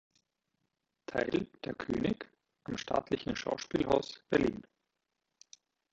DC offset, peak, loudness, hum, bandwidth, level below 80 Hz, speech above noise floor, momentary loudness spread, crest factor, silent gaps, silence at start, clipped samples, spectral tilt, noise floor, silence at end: under 0.1%; -14 dBFS; -35 LUFS; none; 8 kHz; -60 dBFS; 52 dB; 12 LU; 22 dB; none; 1.1 s; under 0.1%; -5.5 dB/octave; -85 dBFS; 1.3 s